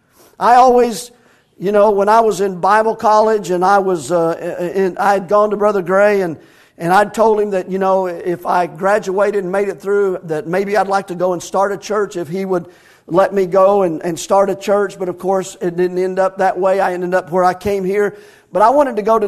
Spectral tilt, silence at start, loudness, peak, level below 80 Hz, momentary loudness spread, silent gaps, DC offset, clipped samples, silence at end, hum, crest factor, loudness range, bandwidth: -5.5 dB/octave; 0.4 s; -15 LUFS; 0 dBFS; -52 dBFS; 9 LU; none; under 0.1%; under 0.1%; 0 s; none; 14 dB; 4 LU; 13.5 kHz